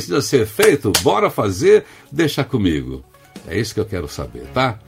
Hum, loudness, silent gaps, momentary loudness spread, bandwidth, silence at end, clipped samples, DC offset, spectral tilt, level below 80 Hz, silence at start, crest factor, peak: none; -17 LUFS; none; 13 LU; 16 kHz; 0.1 s; under 0.1%; under 0.1%; -4.5 dB/octave; -42 dBFS; 0 s; 18 dB; 0 dBFS